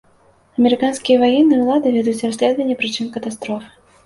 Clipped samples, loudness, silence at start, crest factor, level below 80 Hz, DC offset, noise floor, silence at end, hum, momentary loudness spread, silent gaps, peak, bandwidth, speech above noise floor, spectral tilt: under 0.1%; -17 LUFS; 0.6 s; 14 dB; -58 dBFS; under 0.1%; -53 dBFS; 0.4 s; none; 13 LU; none; -2 dBFS; 11.5 kHz; 37 dB; -4.5 dB/octave